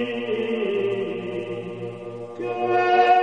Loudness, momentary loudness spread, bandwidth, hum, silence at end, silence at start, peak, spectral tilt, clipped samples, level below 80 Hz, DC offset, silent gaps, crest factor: -24 LUFS; 15 LU; 8.4 kHz; none; 0 s; 0 s; -6 dBFS; -6.5 dB/octave; under 0.1%; -68 dBFS; 0.2%; none; 18 dB